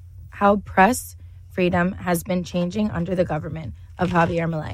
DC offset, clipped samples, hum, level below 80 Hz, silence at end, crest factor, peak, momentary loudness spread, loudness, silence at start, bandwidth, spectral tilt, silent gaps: under 0.1%; under 0.1%; none; -44 dBFS; 0 s; 18 dB; -4 dBFS; 15 LU; -22 LUFS; 0 s; 16 kHz; -6 dB/octave; none